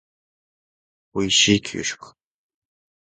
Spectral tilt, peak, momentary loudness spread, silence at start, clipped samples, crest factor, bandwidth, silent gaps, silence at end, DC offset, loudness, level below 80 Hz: -2.5 dB/octave; -4 dBFS; 16 LU; 1.15 s; under 0.1%; 22 dB; 9.6 kHz; none; 0.95 s; under 0.1%; -19 LUFS; -54 dBFS